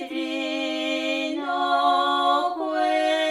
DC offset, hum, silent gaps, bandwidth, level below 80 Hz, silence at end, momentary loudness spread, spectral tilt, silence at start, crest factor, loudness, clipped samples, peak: under 0.1%; none; none; 13.5 kHz; -72 dBFS; 0 s; 6 LU; -1.5 dB/octave; 0 s; 14 dB; -23 LUFS; under 0.1%; -10 dBFS